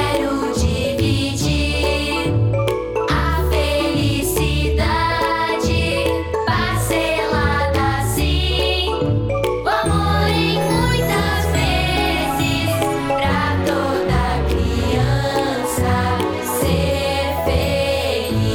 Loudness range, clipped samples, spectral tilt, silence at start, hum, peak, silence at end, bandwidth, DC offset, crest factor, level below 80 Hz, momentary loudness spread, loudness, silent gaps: 1 LU; under 0.1%; -5 dB/octave; 0 s; none; -4 dBFS; 0 s; 20 kHz; under 0.1%; 14 dB; -28 dBFS; 2 LU; -18 LUFS; none